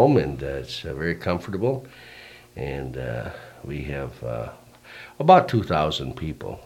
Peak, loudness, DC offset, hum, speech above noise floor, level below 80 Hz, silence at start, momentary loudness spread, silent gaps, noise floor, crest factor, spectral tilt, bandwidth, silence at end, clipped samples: -2 dBFS; -24 LUFS; under 0.1%; none; 21 dB; -46 dBFS; 0 s; 25 LU; none; -45 dBFS; 24 dB; -7 dB/octave; 16.5 kHz; 0 s; under 0.1%